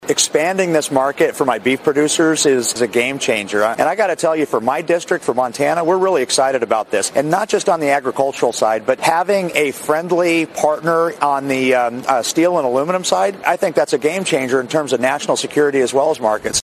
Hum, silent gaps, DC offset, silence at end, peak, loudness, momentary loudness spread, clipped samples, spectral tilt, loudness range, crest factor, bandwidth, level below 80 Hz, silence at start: none; none; under 0.1%; 0 s; 0 dBFS; -16 LUFS; 3 LU; under 0.1%; -3 dB/octave; 1 LU; 16 dB; 16 kHz; -58 dBFS; 0 s